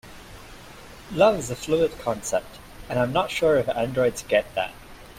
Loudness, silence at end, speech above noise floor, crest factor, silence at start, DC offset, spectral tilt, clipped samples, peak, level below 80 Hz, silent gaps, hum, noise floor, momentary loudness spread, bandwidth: -24 LUFS; 0 s; 21 dB; 20 dB; 0.05 s; under 0.1%; -4.5 dB/octave; under 0.1%; -6 dBFS; -48 dBFS; none; none; -44 dBFS; 23 LU; 16 kHz